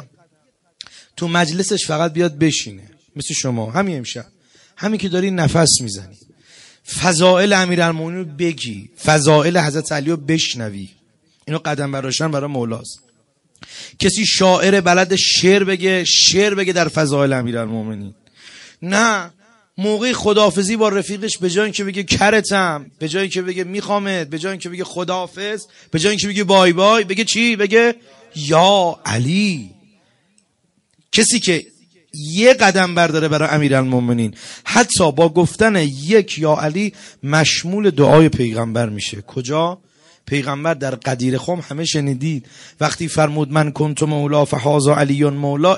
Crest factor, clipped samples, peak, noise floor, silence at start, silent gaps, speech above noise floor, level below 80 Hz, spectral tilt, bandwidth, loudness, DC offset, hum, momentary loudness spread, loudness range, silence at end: 16 dB; under 0.1%; 0 dBFS; -64 dBFS; 0 s; none; 47 dB; -52 dBFS; -4 dB/octave; 11.5 kHz; -16 LUFS; under 0.1%; none; 13 LU; 7 LU; 0 s